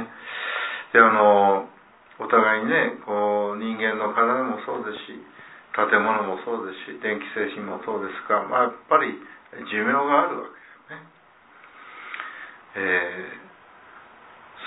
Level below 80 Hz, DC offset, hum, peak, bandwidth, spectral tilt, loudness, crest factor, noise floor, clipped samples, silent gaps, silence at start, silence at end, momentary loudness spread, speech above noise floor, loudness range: -78 dBFS; under 0.1%; none; 0 dBFS; 4 kHz; -8.5 dB/octave; -22 LUFS; 24 dB; -54 dBFS; under 0.1%; none; 0 s; 0 s; 21 LU; 31 dB; 11 LU